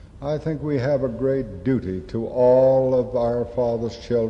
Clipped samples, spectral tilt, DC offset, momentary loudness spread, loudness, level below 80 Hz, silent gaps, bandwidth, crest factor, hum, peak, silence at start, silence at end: under 0.1%; -9 dB/octave; under 0.1%; 11 LU; -22 LUFS; -44 dBFS; none; 7.2 kHz; 12 dB; none; -8 dBFS; 0.05 s; 0 s